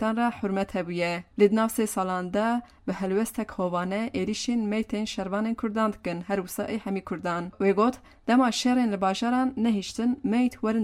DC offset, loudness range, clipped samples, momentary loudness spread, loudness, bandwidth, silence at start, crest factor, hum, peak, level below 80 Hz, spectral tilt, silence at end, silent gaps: under 0.1%; 4 LU; under 0.1%; 8 LU; -27 LUFS; 16 kHz; 0 s; 18 dB; none; -8 dBFS; -56 dBFS; -5.5 dB/octave; 0 s; none